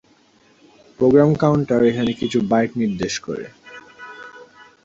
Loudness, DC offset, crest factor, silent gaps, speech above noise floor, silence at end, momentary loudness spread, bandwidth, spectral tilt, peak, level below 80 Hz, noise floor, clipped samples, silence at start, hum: -18 LUFS; under 0.1%; 18 dB; none; 38 dB; 0.4 s; 24 LU; 7.8 kHz; -6.5 dB/octave; -2 dBFS; -52 dBFS; -55 dBFS; under 0.1%; 1 s; none